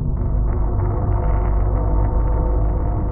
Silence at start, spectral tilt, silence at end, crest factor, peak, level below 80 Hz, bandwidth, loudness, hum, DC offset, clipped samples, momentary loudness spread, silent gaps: 0 s; -12 dB/octave; 0 s; 10 dB; -8 dBFS; -18 dBFS; 2.3 kHz; -21 LUFS; none; under 0.1%; under 0.1%; 2 LU; none